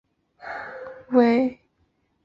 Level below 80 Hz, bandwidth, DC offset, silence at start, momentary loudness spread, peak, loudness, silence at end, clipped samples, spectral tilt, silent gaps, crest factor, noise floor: -66 dBFS; 5.8 kHz; under 0.1%; 0.45 s; 20 LU; -6 dBFS; -21 LUFS; 0.7 s; under 0.1%; -7.5 dB/octave; none; 20 dB; -69 dBFS